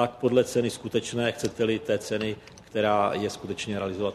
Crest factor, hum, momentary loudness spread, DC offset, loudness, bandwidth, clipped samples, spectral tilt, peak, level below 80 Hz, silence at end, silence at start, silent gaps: 18 dB; none; 9 LU; under 0.1%; -27 LUFS; 13.5 kHz; under 0.1%; -5 dB/octave; -8 dBFS; -60 dBFS; 0 s; 0 s; none